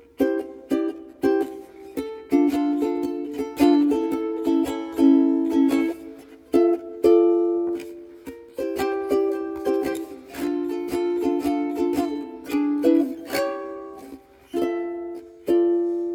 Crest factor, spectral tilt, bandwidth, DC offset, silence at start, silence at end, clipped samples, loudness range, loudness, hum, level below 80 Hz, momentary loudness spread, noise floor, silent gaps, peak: 18 dB; -5.5 dB/octave; 17.5 kHz; under 0.1%; 0.2 s; 0 s; under 0.1%; 5 LU; -23 LUFS; none; -56 dBFS; 16 LU; -44 dBFS; none; -6 dBFS